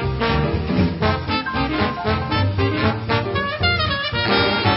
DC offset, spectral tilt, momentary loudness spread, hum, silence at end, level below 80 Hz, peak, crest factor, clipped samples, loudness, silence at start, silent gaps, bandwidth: under 0.1%; -10.5 dB/octave; 4 LU; none; 0 s; -34 dBFS; -4 dBFS; 16 dB; under 0.1%; -20 LUFS; 0 s; none; 5.8 kHz